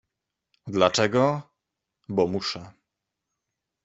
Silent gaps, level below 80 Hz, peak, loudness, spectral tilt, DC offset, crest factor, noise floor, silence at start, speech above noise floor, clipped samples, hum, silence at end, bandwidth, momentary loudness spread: none; -64 dBFS; -4 dBFS; -24 LUFS; -4.5 dB/octave; under 0.1%; 24 dB; -84 dBFS; 0.65 s; 60 dB; under 0.1%; none; 1.15 s; 8 kHz; 14 LU